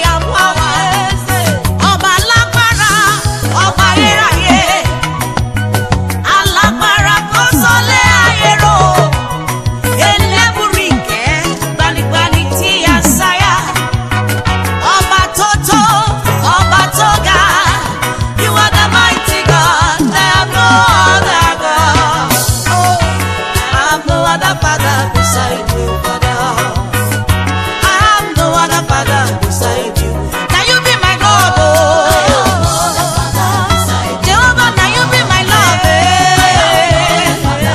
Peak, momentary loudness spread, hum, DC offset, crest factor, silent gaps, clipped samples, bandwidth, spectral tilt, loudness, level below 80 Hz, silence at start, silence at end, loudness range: 0 dBFS; 7 LU; none; under 0.1%; 10 dB; none; 0.1%; 15.5 kHz; -3.5 dB/octave; -9 LUFS; -24 dBFS; 0 s; 0 s; 3 LU